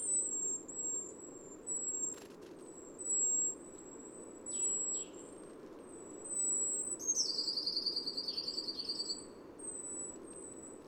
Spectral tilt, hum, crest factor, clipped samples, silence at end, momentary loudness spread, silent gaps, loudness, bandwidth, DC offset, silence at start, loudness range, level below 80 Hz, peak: 0 dB/octave; none; 20 dB; under 0.1%; 0 s; 19 LU; none; -36 LUFS; 18.5 kHz; under 0.1%; 0 s; 3 LU; -74 dBFS; -20 dBFS